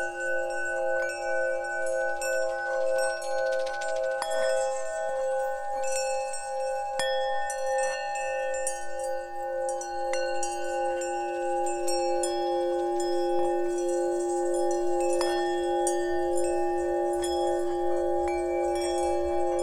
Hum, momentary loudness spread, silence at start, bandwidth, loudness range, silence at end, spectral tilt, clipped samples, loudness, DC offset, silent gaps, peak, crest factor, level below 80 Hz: none; 4 LU; 0 s; 15.5 kHz; 3 LU; 0 s; -3 dB/octave; under 0.1%; -29 LUFS; under 0.1%; none; -12 dBFS; 16 dB; -54 dBFS